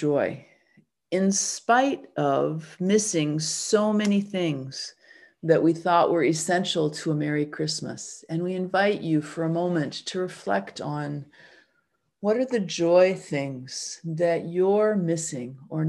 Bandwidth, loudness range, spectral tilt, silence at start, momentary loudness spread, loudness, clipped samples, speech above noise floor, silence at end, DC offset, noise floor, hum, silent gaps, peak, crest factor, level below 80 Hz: 12.5 kHz; 4 LU; -4.5 dB/octave; 0 s; 11 LU; -25 LUFS; under 0.1%; 48 dB; 0 s; under 0.1%; -73 dBFS; none; none; -6 dBFS; 18 dB; -72 dBFS